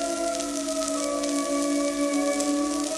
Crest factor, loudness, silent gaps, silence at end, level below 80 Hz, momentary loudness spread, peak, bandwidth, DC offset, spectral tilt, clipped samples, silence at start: 18 dB; -26 LUFS; none; 0 s; -58 dBFS; 3 LU; -10 dBFS; 13.5 kHz; under 0.1%; -2 dB/octave; under 0.1%; 0 s